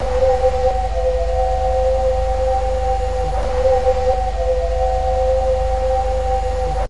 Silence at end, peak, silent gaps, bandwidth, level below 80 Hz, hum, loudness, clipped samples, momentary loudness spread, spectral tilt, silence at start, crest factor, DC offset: 0 s; -4 dBFS; none; 11 kHz; -22 dBFS; none; -19 LUFS; under 0.1%; 4 LU; -6 dB/octave; 0 s; 12 dB; 3%